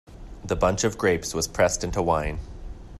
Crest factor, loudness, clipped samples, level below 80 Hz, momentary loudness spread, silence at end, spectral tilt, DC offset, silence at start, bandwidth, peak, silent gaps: 18 dB; -24 LUFS; under 0.1%; -38 dBFS; 17 LU; 0 s; -4 dB/octave; under 0.1%; 0.1 s; 14 kHz; -8 dBFS; none